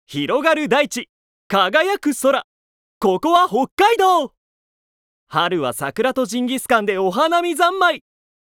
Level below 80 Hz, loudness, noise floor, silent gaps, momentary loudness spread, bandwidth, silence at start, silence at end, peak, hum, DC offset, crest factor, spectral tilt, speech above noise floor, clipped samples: -60 dBFS; -18 LUFS; under -90 dBFS; 1.09-1.50 s, 2.44-3.01 s, 3.71-3.77 s, 4.37-5.27 s; 7 LU; 18.5 kHz; 0.1 s; 0.6 s; -2 dBFS; none; under 0.1%; 18 dB; -3.5 dB/octave; over 73 dB; under 0.1%